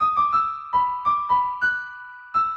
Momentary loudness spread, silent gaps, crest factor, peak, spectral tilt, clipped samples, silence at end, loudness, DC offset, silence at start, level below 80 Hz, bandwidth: 9 LU; none; 12 dB; -10 dBFS; -3.5 dB/octave; under 0.1%; 0 s; -22 LUFS; under 0.1%; 0 s; -56 dBFS; 7.2 kHz